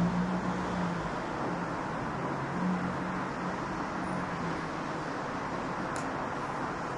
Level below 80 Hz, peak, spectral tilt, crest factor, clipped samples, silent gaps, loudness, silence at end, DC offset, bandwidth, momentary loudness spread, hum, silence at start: -54 dBFS; -20 dBFS; -6.5 dB/octave; 14 dB; under 0.1%; none; -34 LUFS; 0 s; under 0.1%; 11.5 kHz; 3 LU; none; 0 s